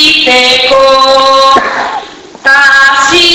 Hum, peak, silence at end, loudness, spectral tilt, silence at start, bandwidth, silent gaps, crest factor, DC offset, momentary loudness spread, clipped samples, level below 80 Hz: none; 0 dBFS; 0 s; -4 LUFS; -1 dB/octave; 0 s; over 20 kHz; none; 6 dB; under 0.1%; 9 LU; 5%; -40 dBFS